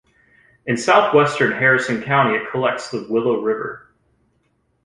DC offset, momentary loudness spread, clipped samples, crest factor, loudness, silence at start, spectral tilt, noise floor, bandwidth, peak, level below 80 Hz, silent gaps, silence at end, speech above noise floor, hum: under 0.1%; 12 LU; under 0.1%; 18 dB; -18 LUFS; 0.65 s; -5 dB/octave; -65 dBFS; 11 kHz; -2 dBFS; -60 dBFS; none; 1.05 s; 47 dB; none